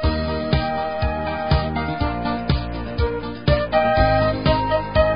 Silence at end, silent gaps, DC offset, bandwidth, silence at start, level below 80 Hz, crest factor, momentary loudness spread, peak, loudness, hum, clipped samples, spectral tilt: 0 s; none; 0.8%; 5.4 kHz; 0 s; -28 dBFS; 16 dB; 7 LU; -4 dBFS; -21 LUFS; none; under 0.1%; -11.5 dB/octave